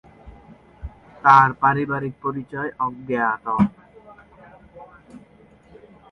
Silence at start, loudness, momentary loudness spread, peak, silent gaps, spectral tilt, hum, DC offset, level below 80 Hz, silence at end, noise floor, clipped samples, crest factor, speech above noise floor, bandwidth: 0.25 s; -20 LUFS; 26 LU; 0 dBFS; none; -7.5 dB/octave; none; under 0.1%; -50 dBFS; 0.95 s; -51 dBFS; under 0.1%; 24 dB; 32 dB; 6.8 kHz